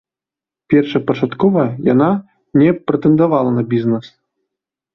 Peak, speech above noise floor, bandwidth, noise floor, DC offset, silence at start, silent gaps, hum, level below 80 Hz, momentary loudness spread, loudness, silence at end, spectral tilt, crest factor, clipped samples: -2 dBFS; 74 dB; 6 kHz; -88 dBFS; under 0.1%; 0.7 s; none; none; -54 dBFS; 6 LU; -15 LUFS; 0.85 s; -10 dB/octave; 14 dB; under 0.1%